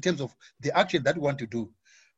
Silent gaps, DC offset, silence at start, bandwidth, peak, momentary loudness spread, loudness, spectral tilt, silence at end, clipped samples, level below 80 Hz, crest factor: none; under 0.1%; 0 s; 8 kHz; -8 dBFS; 12 LU; -28 LUFS; -5 dB/octave; 0.5 s; under 0.1%; -64 dBFS; 20 dB